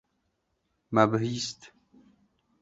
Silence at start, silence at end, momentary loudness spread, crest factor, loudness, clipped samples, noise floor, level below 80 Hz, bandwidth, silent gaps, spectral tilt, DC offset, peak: 0.9 s; 0.95 s; 13 LU; 26 dB; -27 LUFS; under 0.1%; -77 dBFS; -68 dBFS; 8 kHz; none; -5.5 dB/octave; under 0.1%; -6 dBFS